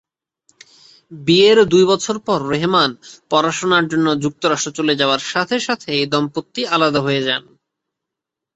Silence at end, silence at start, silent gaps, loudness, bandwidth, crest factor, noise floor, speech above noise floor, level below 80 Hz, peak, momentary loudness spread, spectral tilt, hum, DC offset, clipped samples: 1.15 s; 1.1 s; none; -16 LUFS; 8.2 kHz; 16 dB; -83 dBFS; 67 dB; -58 dBFS; 0 dBFS; 8 LU; -4 dB/octave; none; under 0.1%; under 0.1%